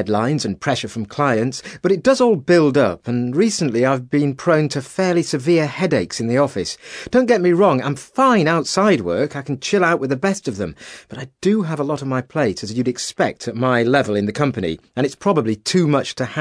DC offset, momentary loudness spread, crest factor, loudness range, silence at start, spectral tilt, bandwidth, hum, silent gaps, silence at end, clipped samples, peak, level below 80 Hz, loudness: under 0.1%; 9 LU; 16 dB; 4 LU; 0 s; -5.5 dB/octave; 11 kHz; none; none; 0 s; under 0.1%; -2 dBFS; -54 dBFS; -18 LUFS